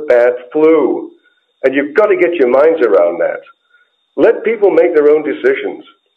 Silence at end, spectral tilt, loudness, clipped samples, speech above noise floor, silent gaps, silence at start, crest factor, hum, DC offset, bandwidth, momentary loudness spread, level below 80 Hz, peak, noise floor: 0.35 s; -7 dB/octave; -12 LUFS; under 0.1%; 44 dB; none; 0 s; 12 dB; none; under 0.1%; 5.4 kHz; 12 LU; -62 dBFS; 0 dBFS; -55 dBFS